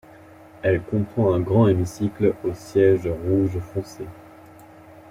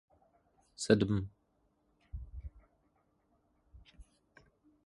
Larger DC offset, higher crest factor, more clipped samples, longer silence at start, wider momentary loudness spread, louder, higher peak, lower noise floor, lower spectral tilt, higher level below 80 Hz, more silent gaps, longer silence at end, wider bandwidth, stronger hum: neither; second, 16 dB vs 28 dB; neither; second, 0.65 s vs 0.8 s; second, 13 LU vs 22 LU; first, -22 LUFS vs -32 LUFS; first, -6 dBFS vs -12 dBFS; second, -46 dBFS vs -76 dBFS; first, -8.5 dB/octave vs -6 dB/octave; about the same, -50 dBFS vs -54 dBFS; neither; about the same, 0.9 s vs 0.85 s; first, 15 kHz vs 11.5 kHz; neither